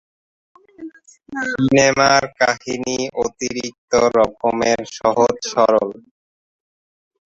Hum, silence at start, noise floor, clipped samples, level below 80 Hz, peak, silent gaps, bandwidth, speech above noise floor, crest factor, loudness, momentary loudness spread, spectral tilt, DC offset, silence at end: none; 0.8 s; -38 dBFS; under 0.1%; -52 dBFS; 0 dBFS; 3.78-3.88 s; 8 kHz; 20 dB; 18 dB; -17 LUFS; 14 LU; -3.5 dB/octave; under 0.1%; 1.3 s